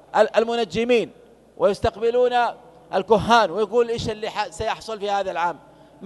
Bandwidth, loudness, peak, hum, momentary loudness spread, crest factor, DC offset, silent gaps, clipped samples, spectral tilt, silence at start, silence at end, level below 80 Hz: 12 kHz; -22 LUFS; -2 dBFS; none; 10 LU; 20 dB; under 0.1%; none; under 0.1%; -4.5 dB/octave; 0.15 s; 0 s; -48 dBFS